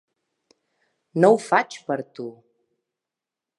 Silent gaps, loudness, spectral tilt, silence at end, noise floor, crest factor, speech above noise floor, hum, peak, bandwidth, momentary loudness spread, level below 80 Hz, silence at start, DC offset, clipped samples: none; -21 LUFS; -6 dB/octave; 1.25 s; -88 dBFS; 22 dB; 67 dB; none; -2 dBFS; 11.5 kHz; 19 LU; -82 dBFS; 1.15 s; under 0.1%; under 0.1%